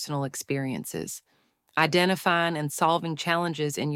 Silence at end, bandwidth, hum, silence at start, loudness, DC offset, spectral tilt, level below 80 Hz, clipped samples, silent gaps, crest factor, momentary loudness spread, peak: 0 s; 17 kHz; none; 0 s; -26 LUFS; under 0.1%; -4.5 dB/octave; -68 dBFS; under 0.1%; none; 20 dB; 11 LU; -6 dBFS